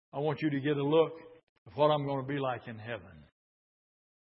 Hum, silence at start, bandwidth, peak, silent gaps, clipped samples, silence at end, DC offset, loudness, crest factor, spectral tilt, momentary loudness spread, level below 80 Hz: none; 0.15 s; 5.8 kHz; -14 dBFS; 1.43-1.66 s; under 0.1%; 1 s; under 0.1%; -31 LUFS; 20 dB; -10.5 dB/octave; 15 LU; -72 dBFS